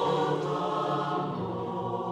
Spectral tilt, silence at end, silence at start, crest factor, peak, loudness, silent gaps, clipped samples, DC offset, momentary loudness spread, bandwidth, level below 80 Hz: -7 dB/octave; 0 s; 0 s; 14 dB; -16 dBFS; -30 LUFS; none; under 0.1%; under 0.1%; 5 LU; 11 kHz; -66 dBFS